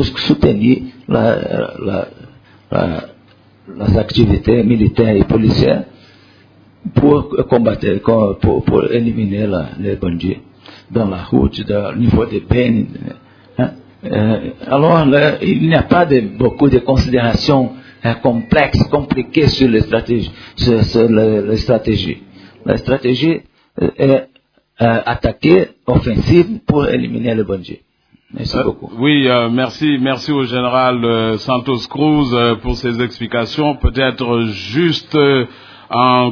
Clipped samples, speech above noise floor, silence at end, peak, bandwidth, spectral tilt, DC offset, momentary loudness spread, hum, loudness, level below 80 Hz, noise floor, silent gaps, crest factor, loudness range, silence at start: under 0.1%; 38 dB; 0 s; 0 dBFS; 5.4 kHz; -8 dB/octave; under 0.1%; 9 LU; none; -14 LUFS; -32 dBFS; -52 dBFS; none; 14 dB; 4 LU; 0 s